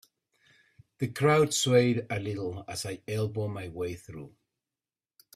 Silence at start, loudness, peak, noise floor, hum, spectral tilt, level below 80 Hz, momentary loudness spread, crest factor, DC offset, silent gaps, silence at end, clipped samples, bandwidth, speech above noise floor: 1 s; -29 LUFS; -10 dBFS; under -90 dBFS; none; -5 dB/octave; -64 dBFS; 13 LU; 20 dB; under 0.1%; none; 1.05 s; under 0.1%; 15.5 kHz; over 61 dB